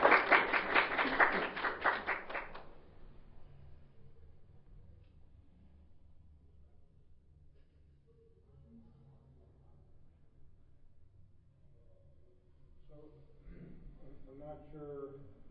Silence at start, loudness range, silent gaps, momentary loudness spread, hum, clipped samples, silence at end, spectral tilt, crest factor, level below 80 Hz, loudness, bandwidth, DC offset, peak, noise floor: 0 s; 30 LU; none; 28 LU; none; under 0.1%; 0 s; -1 dB/octave; 30 dB; -60 dBFS; -32 LUFS; 5.6 kHz; under 0.1%; -10 dBFS; -64 dBFS